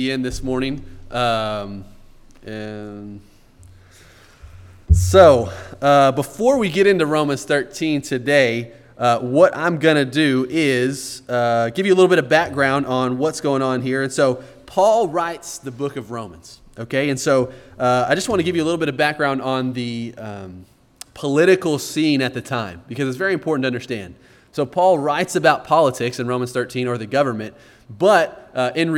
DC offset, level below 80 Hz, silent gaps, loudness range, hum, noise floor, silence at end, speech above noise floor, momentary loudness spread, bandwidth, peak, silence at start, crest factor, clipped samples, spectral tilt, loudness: under 0.1%; -38 dBFS; none; 6 LU; none; -47 dBFS; 0 s; 29 dB; 16 LU; 17 kHz; 0 dBFS; 0 s; 18 dB; under 0.1%; -5.5 dB/octave; -18 LUFS